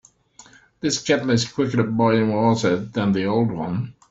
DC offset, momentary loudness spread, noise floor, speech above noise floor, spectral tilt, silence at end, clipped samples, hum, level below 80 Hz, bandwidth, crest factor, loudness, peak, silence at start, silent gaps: under 0.1%; 8 LU; -50 dBFS; 30 dB; -5.5 dB/octave; 0.2 s; under 0.1%; none; -56 dBFS; 8 kHz; 18 dB; -21 LUFS; -4 dBFS; 0.85 s; none